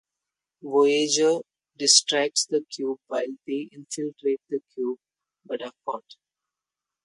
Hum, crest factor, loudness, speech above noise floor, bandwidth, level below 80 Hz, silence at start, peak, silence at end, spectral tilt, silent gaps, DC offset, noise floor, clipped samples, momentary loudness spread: none; 24 dB; -24 LUFS; 64 dB; 11.5 kHz; -80 dBFS; 0.65 s; -2 dBFS; 1.05 s; -1.5 dB/octave; none; under 0.1%; -89 dBFS; under 0.1%; 17 LU